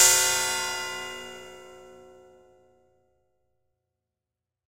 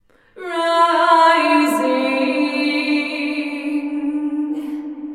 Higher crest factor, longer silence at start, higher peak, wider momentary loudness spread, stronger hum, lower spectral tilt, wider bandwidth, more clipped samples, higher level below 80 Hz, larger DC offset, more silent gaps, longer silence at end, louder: first, 26 dB vs 16 dB; second, 0 s vs 0.35 s; about the same, -4 dBFS vs -2 dBFS; first, 26 LU vs 12 LU; neither; second, 1 dB/octave vs -2.5 dB/octave; about the same, 16 kHz vs 15 kHz; neither; about the same, -66 dBFS vs -66 dBFS; neither; neither; first, 2.75 s vs 0 s; second, -24 LUFS vs -17 LUFS